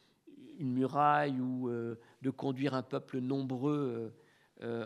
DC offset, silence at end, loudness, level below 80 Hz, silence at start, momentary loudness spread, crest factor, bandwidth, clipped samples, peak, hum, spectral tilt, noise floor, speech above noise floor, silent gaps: under 0.1%; 0 s; -35 LUFS; -82 dBFS; 0.25 s; 14 LU; 20 dB; 10.5 kHz; under 0.1%; -14 dBFS; none; -8 dB/octave; -57 dBFS; 23 dB; none